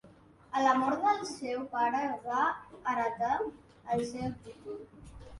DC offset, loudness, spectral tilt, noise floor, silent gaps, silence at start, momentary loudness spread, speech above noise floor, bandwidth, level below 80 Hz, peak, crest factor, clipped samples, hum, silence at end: under 0.1%; -32 LUFS; -5 dB/octave; -58 dBFS; none; 0.05 s; 18 LU; 26 dB; 11.5 kHz; -62 dBFS; -12 dBFS; 20 dB; under 0.1%; none; 0 s